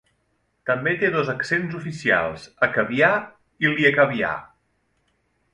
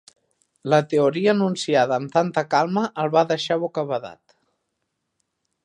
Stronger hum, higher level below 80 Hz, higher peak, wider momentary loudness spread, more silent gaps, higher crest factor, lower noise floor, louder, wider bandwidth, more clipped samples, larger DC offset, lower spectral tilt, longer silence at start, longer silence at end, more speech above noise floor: neither; first, -58 dBFS vs -72 dBFS; about the same, -2 dBFS vs -4 dBFS; first, 12 LU vs 8 LU; neither; about the same, 20 dB vs 18 dB; second, -69 dBFS vs -77 dBFS; about the same, -21 LUFS vs -21 LUFS; about the same, 11.5 kHz vs 10.5 kHz; neither; neither; about the same, -6 dB/octave vs -5.5 dB/octave; about the same, 0.65 s vs 0.65 s; second, 1.05 s vs 1.5 s; second, 48 dB vs 56 dB